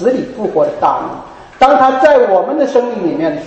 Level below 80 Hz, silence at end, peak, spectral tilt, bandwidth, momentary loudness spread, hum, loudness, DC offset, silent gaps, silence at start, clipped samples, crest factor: -48 dBFS; 0 s; 0 dBFS; -6 dB/octave; 8.4 kHz; 9 LU; none; -12 LUFS; under 0.1%; none; 0 s; under 0.1%; 12 dB